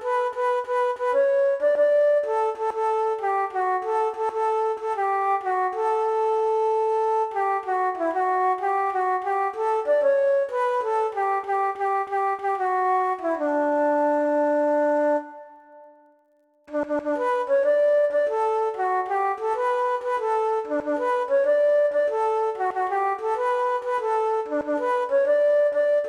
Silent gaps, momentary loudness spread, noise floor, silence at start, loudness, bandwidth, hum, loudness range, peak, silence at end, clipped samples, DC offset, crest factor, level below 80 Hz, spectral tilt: none; 5 LU; -63 dBFS; 0 s; -23 LUFS; 10 kHz; none; 2 LU; -12 dBFS; 0 s; under 0.1%; under 0.1%; 10 dB; -68 dBFS; -4 dB/octave